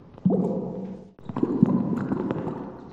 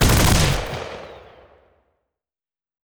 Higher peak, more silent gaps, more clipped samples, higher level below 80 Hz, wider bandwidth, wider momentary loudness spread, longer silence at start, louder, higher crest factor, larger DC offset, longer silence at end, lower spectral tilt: about the same, -4 dBFS vs -6 dBFS; neither; neither; second, -58 dBFS vs -28 dBFS; second, 4.4 kHz vs over 20 kHz; second, 14 LU vs 22 LU; about the same, 0 s vs 0 s; second, -26 LUFS vs -19 LUFS; first, 22 dB vs 16 dB; neither; second, 0 s vs 1.7 s; first, -11 dB/octave vs -4 dB/octave